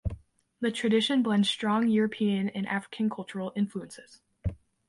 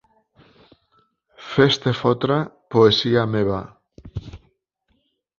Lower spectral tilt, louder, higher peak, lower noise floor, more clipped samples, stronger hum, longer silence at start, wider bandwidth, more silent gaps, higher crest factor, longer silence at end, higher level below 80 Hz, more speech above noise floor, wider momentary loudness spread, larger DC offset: about the same, -5.5 dB/octave vs -6.5 dB/octave; second, -28 LUFS vs -19 LUFS; second, -14 dBFS vs -2 dBFS; second, -47 dBFS vs -69 dBFS; neither; neither; second, 0.05 s vs 1.4 s; first, 11.5 kHz vs 7.4 kHz; neither; about the same, 16 dB vs 20 dB; second, 0.35 s vs 1.05 s; about the same, -48 dBFS vs -50 dBFS; second, 20 dB vs 50 dB; second, 14 LU vs 20 LU; neither